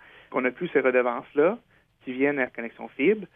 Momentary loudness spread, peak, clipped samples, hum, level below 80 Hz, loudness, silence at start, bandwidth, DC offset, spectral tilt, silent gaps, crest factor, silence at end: 14 LU; -10 dBFS; under 0.1%; none; -70 dBFS; -25 LUFS; 0.3 s; 3.7 kHz; under 0.1%; -9 dB/octave; none; 16 dB; 0.1 s